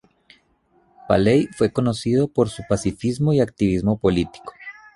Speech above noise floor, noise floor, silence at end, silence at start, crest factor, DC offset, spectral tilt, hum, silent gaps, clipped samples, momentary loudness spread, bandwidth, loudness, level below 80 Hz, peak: 42 dB; -61 dBFS; 0.25 s; 1.05 s; 18 dB; under 0.1%; -7 dB/octave; none; none; under 0.1%; 8 LU; 11.5 kHz; -20 LUFS; -44 dBFS; -2 dBFS